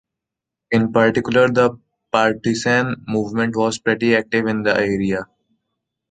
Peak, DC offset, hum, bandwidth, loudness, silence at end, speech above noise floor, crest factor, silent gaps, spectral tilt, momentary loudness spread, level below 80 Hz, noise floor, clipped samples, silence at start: 0 dBFS; under 0.1%; none; 9.2 kHz; -18 LUFS; 0.85 s; 67 dB; 18 dB; none; -5.5 dB/octave; 6 LU; -52 dBFS; -84 dBFS; under 0.1%; 0.7 s